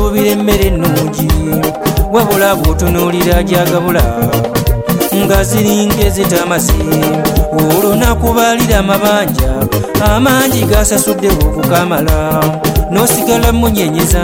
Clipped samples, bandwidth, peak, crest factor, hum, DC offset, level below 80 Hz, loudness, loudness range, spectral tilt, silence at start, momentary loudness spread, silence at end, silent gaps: under 0.1%; 16.5 kHz; 0 dBFS; 10 dB; none; under 0.1%; -18 dBFS; -11 LUFS; 1 LU; -5 dB/octave; 0 s; 4 LU; 0 s; none